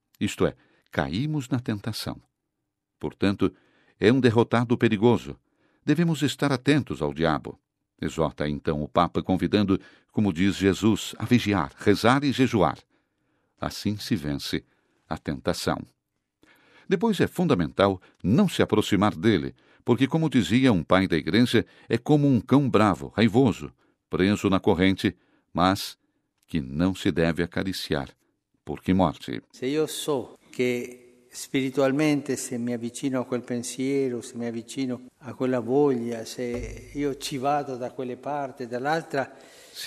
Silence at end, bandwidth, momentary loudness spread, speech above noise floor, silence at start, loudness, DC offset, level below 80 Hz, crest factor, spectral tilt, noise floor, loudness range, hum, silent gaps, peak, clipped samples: 0 s; 14.5 kHz; 12 LU; 57 dB; 0.2 s; -25 LUFS; under 0.1%; -54 dBFS; 22 dB; -6 dB/octave; -81 dBFS; 7 LU; none; none; -4 dBFS; under 0.1%